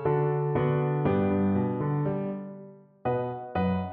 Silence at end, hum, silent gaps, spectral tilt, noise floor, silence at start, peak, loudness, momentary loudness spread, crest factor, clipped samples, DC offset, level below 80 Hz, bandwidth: 0 s; none; none; -12 dB/octave; -48 dBFS; 0 s; -14 dBFS; -28 LUFS; 10 LU; 14 dB; under 0.1%; under 0.1%; -56 dBFS; 4.3 kHz